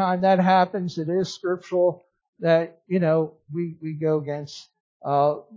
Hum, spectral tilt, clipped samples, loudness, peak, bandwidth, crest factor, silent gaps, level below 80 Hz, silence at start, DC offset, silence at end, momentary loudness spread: none; -7 dB/octave; under 0.1%; -23 LUFS; -6 dBFS; 7.6 kHz; 16 dB; 2.28-2.33 s, 4.80-5.00 s; -70 dBFS; 0 s; under 0.1%; 0 s; 13 LU